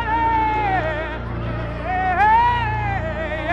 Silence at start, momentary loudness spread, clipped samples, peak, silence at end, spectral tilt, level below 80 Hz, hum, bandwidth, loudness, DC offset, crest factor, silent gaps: 0 s; 11 LU; under 0.1%; -4 dBFS; 0 s; -7 dB/octave; -32 dBFS; none; 7.8 kHz; -20 LUFS; under 0.1%; 16 dB; none